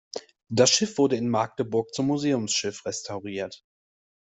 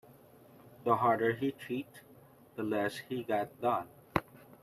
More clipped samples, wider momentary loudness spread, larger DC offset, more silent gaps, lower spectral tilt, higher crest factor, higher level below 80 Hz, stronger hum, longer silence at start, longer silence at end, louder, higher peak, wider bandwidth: neither; first, 14 LU vs 11 LU; neither; neither; second, -3.5 dB/octave vs -6.5 dB/octave; about the same, 20 dB vs 24 dB; about the same, -66 dBFS vs -66 dBFS; neither; about the same, 0.15 s vs 0.1 s; first, 0.75 s vs 0.4 s; first, -25 LUFS vs -34 LUFS; first, -6 dBFS vs -12 dBFS; second, 8.4 kHz vs 14.5 kHz